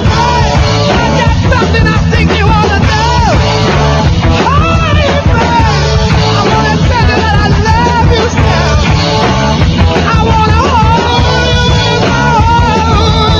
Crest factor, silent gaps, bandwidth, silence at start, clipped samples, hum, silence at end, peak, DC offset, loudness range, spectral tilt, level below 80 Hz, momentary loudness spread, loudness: 8 dB; none; 7.4 kHz; 0 s; 0.4%; none; 0 s; 0 dBFS; under 0.1%; 1 LU; -5.5 dB/octave; -16 dBFS; 1 LU; -8 LUFS